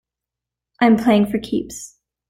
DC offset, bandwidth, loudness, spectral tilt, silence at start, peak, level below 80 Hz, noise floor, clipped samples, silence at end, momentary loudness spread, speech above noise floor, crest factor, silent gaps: under 0.1%; 15.5 kHz; -17 LUFS; -5.5 dB/octave; 0.8 s; -2 dBFS; -52 dBFS; -86 dBFS; under 0.1%; 0.45 s; 19 LU; 69 dB; 18 dB; none